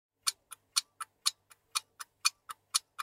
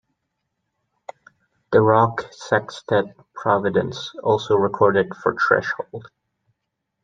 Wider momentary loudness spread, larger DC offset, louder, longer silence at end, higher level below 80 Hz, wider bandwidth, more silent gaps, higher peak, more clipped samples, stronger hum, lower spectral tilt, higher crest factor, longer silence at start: first, 16 LU vs 12 LU; neither; second, -34 LUFS vs -20 LUFS; second, 0 s vs 1 s; second, -88 dBFS vs -62 dBFS; first, 16 kHz vs 7.8 kHz; neither; second, -10 dBFS vs -2 dBFS; neither; neither; second, 5.5 dB/octave vs -6.5 dB/octave; first, 28 dB vs 20 dB; second, 0.25 s vs 1.7 s